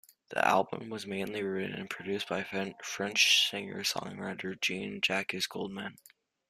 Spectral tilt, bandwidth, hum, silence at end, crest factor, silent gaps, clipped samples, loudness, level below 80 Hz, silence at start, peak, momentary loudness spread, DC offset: -2.5 dB/octave; 15 kHz; none; 0.55 s; 22 dB; none; under 0.1%; -31 LUFS; -74 dBFS; 0.3 s; -12 dBFS; 14 LU; under 0.1%